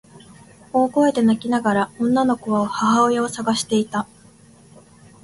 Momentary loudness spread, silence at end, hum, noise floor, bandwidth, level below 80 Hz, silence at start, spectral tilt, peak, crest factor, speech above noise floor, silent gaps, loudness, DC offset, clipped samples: 6 LU; 1.2 s; none; -49 dBFS; 11.5 kHz; -58 dBFS; 0.15 s; -5 dB/octave; -6 dBFS; 14 dB; 30 dB; none; -19 LUFS; under 0.1%; under 0.1%